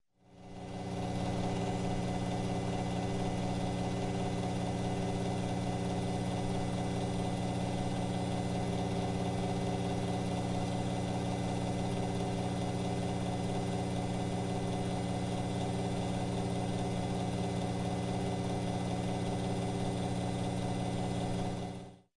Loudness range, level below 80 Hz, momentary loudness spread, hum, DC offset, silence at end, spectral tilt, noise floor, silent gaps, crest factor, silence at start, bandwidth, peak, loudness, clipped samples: 0 LU; -50 dBFS; 1 LU; none; under 0.1%; 0.2 s; -6.5 dB/octave; -55 dBFS; none; 12 dB; 0.3 s; 11.5 kHz; -22 dBFS; -35 LUFS; under 0.1%